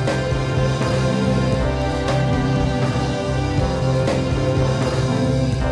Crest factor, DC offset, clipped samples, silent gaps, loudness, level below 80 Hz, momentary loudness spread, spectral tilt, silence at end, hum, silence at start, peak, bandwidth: 12 dB; under 0.1%; under 0.1%; none; -20 LUFS; -30 dBFS; 2 LU; -6.5 dB/octave; 0 s; none; 0 s; -6 dBFS; 11 kHz